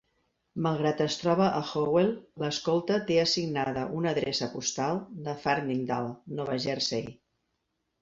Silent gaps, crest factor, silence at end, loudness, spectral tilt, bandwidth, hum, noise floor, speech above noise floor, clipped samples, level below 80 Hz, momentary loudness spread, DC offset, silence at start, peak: none; 18 dB; 0.9 s; -29 LUFS; -4.5 dB/octave; 7.8 kHz; none; -80 dBFS; 51 dB; under 0.1%; -64 dBFS; 9 LU; under 0.1%; 0.55 s; -12 dBFS